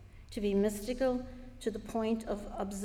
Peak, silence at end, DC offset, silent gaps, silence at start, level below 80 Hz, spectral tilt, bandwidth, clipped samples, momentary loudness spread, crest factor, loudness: -20 dBFS; 0 s; under 0.1%; none; 0 s; -50 dBFS; -6 dB/octave; 17 kHz; under 0.1%; 9 LU; 14 dB; -35 LUFS